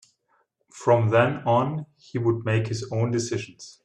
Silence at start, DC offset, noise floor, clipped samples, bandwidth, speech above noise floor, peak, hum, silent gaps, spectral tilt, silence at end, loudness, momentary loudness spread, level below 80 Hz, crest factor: 0.75 s; under 0.1%; -69 dBFS; under 0.1%; 9.6 kHz; 45 dB; -6 dBFS; none; none; -6.5 dB/octave; 0.15 s; -24 LUFS; 12 LU; -60 dBFS; 18 dB